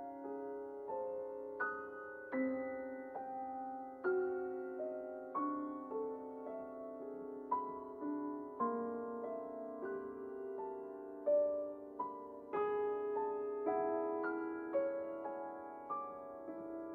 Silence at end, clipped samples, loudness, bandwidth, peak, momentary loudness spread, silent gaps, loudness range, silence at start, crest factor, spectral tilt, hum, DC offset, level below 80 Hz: 0 s; under 0.1%; -42 LUFS; 4.4 kHz; -24 dBFS; 10 LU; none; 4 LU; 0 s; 16 dB; -8.5 dB/octave; none; under 0.1%; -80 dBFS